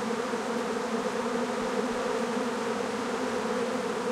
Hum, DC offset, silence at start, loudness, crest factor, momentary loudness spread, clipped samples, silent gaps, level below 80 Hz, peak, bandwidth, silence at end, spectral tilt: none; under 0.1%; 0 s; -30 LUFS; 14 dB; 1 LU; under 0.1%; none; -64 dBFS; -16 dBFS; 15 kHz; 0 s; -4 dB/octave